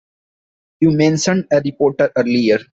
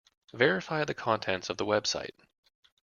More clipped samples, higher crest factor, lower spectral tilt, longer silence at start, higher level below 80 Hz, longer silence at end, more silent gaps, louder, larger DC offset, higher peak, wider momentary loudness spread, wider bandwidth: neither; second, 14 dB vs 24 dB; first, -5.5 dB/octave vs -3.5 dB/octave; first, 0.8 s vs 0.35 s; first, -52 dBFS vs -68 dBFS; second, 0.1 s vs 0.9 s; neither; first, -16 LUFS vs -30 LUFS; neither; first, -2 dBFS vs -8 dBFS; second, 4 LU vs 9 LU; first, 8 kHz vs 7.2 kHz